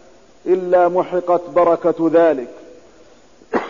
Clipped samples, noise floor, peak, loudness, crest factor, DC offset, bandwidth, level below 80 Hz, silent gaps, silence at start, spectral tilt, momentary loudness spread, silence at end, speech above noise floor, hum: under 0.1%; -48 dBFS; -4 dBFS; -16 LUFS; 14 dB; 0.3%; 7.4 kHz; -58 dBFS; none; 0.45 s; -7.5 dB/octave; 10 LU; 0 s; 33 dB; none